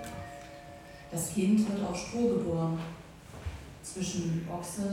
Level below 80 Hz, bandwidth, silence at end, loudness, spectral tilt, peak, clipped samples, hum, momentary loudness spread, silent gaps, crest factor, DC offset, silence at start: -52 dBFS; 16.5 kHz; 0 s; -32 LUFS; -6 dB/octave; -16 dBFS; under 0.1%; none; 20 LU; none; 16 dB; under 0.1%; 0 s